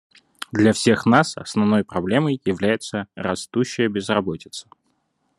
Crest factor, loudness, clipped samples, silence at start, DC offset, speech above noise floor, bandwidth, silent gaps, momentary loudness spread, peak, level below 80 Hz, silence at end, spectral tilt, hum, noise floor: 20 dB; -21 LUFS; under 0.1%; 0.55 s; under 0.1%; 49 dB; 12 kHz; none; 12 LU; 0 dBFS; -62 dBFS; 0.8 s; -5.5 dB/octave; none; -69 dBFS